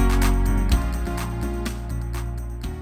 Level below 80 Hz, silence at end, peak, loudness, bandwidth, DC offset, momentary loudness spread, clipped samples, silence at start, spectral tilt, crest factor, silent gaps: -24 dBFS; 0 s; -8 dBFS; -26 LUFS; 15.5 kHz; under 0.1%; 10 LU; under 0.1%; 0 s; -6 dB/octave; 14 dB; none